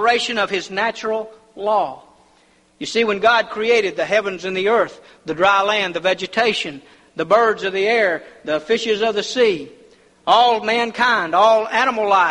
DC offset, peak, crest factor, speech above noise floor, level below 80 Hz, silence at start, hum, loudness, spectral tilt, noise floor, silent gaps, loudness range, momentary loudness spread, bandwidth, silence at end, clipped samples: under 0.1%; -2 dBFS; 16 dB; 38 dB; -60 dBFS; 0 s; none; -18 LUFS; -3 dB/octave; -55 dBFS; none; 3 LU; 12 LU; 11 kHz; 0 s; under 0.1%